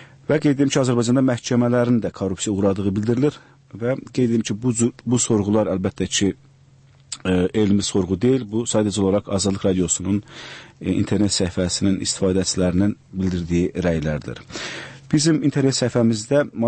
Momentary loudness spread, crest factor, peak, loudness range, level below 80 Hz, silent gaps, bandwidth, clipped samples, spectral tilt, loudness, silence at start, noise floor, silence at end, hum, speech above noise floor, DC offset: 8 LU; 14 dB; -6 dBFS; 2 LU; -46 dBFS; none; 8.8 kHz; under 0.1%; -5 dB/octave; -20 LUFS; 0 s; -51 dBFS; 0 s; none; 31 dB; under 0.1%